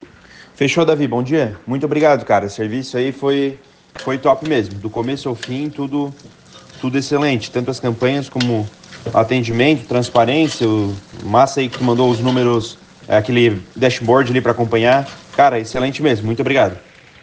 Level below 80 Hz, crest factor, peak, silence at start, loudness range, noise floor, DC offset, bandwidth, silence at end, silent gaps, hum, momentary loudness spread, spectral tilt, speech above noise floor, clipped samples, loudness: -52 dBFS; 16 dB; 0 dBFS; 0.6 s; 5 LU; -43 dBFS; under 0.1%; 9.6 kHz; 0.45 s; none; none; 9 LU; -6 dB/octave; 27 dB; under 0.1%; -17 LUFS